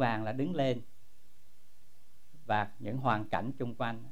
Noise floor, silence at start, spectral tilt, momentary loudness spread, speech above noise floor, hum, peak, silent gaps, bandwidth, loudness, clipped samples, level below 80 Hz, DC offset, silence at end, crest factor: -68 dBFS; 0 s; -7.5 dB/octave; 7 LU; 35 dB; none; -16 dBFS; none; 16 kHz; -34 LUFS; under 0.1%; -66 dBFS; 1%; 0 s; 20 dB